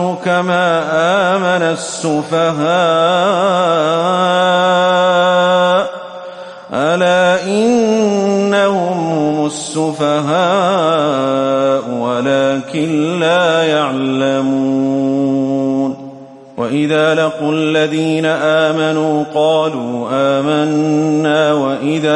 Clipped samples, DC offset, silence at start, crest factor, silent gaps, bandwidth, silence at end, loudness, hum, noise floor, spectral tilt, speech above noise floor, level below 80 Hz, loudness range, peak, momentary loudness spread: under 0.1%; under 0.1%; 0 s; 12 dB; none; 11.5 kHz; 0 s; -14 LUFS; none; -34 dBFS; -5 dB/octave; 21 dB; -62 dBFS; 3 LU; -2 dBFS; 6 LU